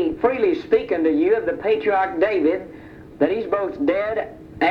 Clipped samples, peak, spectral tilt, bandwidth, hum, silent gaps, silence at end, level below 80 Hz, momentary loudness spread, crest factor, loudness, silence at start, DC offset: under 0.1%; -6 dBFS; -7.5 dB/octave; 5.8 kHz; none; none; 0 s; -52 dBFS; 8 LU; 16 dB; -21 LUFS; 0 s; under 0.1%